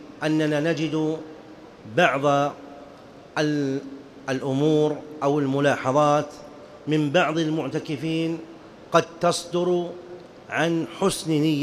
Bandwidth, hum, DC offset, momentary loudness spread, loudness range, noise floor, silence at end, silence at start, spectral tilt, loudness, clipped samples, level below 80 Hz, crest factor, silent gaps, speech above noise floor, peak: 15 kHz; none; under 0.1%; 20 LU; 3 LU; -45 dBFS; 0 s; 0 s; -5.5 dB/octave; -24 LUFS; under 0.1%; -62 dBFS; 20 dB; none; 23 dB; -4 dBFS